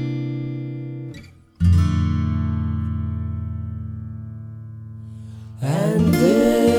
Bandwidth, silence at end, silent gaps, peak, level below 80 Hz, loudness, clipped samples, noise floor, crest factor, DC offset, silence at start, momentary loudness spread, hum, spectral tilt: 16.5 kHz; 0 s; none; -4 dBFS; -36 dBFS; -21 LUFS; under 0.1%; -41 dBFS; 18 dB; under 0.1%; 0 s; 21 LU; none; -7.5 dB/octave